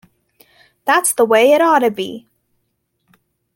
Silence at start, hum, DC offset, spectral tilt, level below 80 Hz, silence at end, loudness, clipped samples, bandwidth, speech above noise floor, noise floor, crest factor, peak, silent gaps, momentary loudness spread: 0.85 s; none; under 0.1%; -2.5 dB/octave; -68 dBFS; 1.35 s; -14 LUFS; under 0.1%; 17 kHz; 56 dB; -69 dBFS; 16 dB; -2 dBFS; none; 15 LU